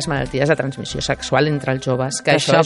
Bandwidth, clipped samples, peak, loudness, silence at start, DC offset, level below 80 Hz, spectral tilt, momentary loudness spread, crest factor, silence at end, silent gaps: 11.5 kHz; under 0.1%; 0 dBFS; -19 LUFS; 0 s; under 0.1%; -42 dBFS; -4.5 dB/octave; 5 LU; 18 dB; 0 s; none